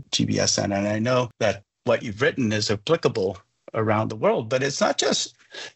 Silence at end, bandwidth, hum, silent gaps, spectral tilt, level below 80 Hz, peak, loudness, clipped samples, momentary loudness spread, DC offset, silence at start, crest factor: 0.05 s; 8.2 kHz; none; none; -4 dB/octave; -60 dBFS; -8 dBFS; -23 LUFS; under 0.1%; 7 LU; under 0.1%; 0 s; 16 dB